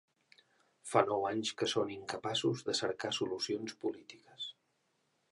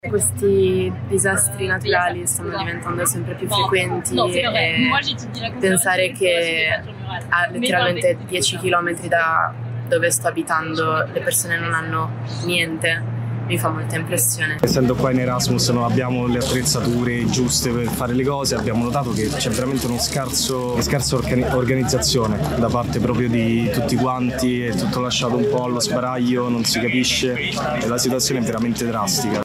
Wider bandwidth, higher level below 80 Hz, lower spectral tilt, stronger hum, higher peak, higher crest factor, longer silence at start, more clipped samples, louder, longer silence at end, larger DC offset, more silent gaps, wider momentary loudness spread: second, 11.5 kHz vs 16 kHz; second, -76 dBFS vs -40 dBFS; about the same, -4 dB/octave vs -4 dB/octave; neither; second, -12 dBFS vs 0 dBFS; first, 26 dB vs 20 dB; first, 0.85 s vs 0.05 s; neither; second, -36 LUFS vs -19 LUFS; first, 0.8 s vs 0 s; neither; neither; first, 13 LU vs 4 LU